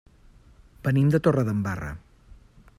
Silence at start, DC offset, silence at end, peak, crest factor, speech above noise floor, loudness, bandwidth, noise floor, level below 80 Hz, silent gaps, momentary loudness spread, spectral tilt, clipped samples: 0.85 s; under 0.1%; 0.8 s; -8 dBFS; 20 dB; 31 dB; -24 LUFS; 13.5 kHz; -53 dBFS; -50 dBFS; none; 16 LU; -8.5 dB/octave; under 0.1%